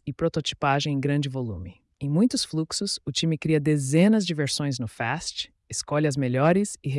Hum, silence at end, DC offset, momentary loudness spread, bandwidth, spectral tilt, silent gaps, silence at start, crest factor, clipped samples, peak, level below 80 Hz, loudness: none; 0 s; under 0.1%; 11 LU; 12 kHz; -5 dB/octave; none; 0.05 s; 16 dB; under 0.1%; -10 dBFS; -56 dBFS; -25 LUFS